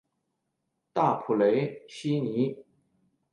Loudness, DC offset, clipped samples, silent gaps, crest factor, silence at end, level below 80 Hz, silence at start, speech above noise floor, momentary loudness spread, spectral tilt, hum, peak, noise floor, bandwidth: -28 LUFS; under 0.1%; under 0.1%; none; 18 dB; 0.7 s; -74 dBFS; 0.95 s; 54 dB; 11 LU; -7.5 dB/octave; none; -12 dBFS; -80 dBFS; 11 kHz